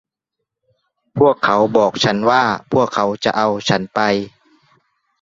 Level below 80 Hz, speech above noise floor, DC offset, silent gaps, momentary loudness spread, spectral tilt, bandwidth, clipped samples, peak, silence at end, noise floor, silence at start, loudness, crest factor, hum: -54 dBFS; 64 dB; under 0.1%; none; 4 LU; -5 dB/octave; 7.8 kHz; under 0.1%; -2 dBFS; 0.95 s; -79 dBFS; 1.15 s; -16 LUFS; 16 dB; none